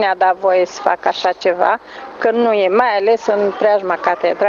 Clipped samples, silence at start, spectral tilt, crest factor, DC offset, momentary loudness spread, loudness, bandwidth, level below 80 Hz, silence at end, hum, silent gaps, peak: under 0.1%; 0 s; -4 dB/octave; 16 dB; under 0.1%; 4 LU; -15 LUFS; 7.4 kHz; -62 dBFS; 0 s; none; none; 0 dBFS